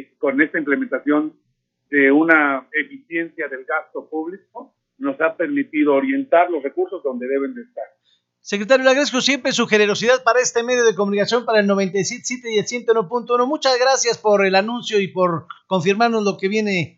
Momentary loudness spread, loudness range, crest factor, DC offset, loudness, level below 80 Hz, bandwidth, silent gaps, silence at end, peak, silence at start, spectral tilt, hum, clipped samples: 12 LU; 4 LU; 18 dB; under 0.1%; -18 LUFS; -74 dBFS; 8 kHz; none; 0.1 s; 0 dBFS; 0 s; -3.5 dB/octave; none; under 0.1%